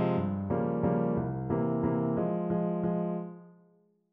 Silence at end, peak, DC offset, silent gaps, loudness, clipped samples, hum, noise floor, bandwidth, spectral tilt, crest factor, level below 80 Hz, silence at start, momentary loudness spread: 0.6 s; -16 dBFS; under 0.1%; none; -31 LUFS; under 0.1%; none; -66 dBFS; 3.8 kHz; -10 dB/octave; 14 dB; -56 dBFS; 0 s; 5 LU